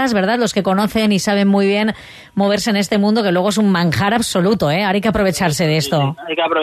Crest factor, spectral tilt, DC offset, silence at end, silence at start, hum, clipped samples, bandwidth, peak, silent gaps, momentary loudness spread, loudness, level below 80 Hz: 12 dB; -5 dB/octave; under 0.1%; 0 s; 0 s; none; under 0.1%; 13.5 kHz; -2 dBFS; none; 4 LU; -16 LUFS; -44 dBFS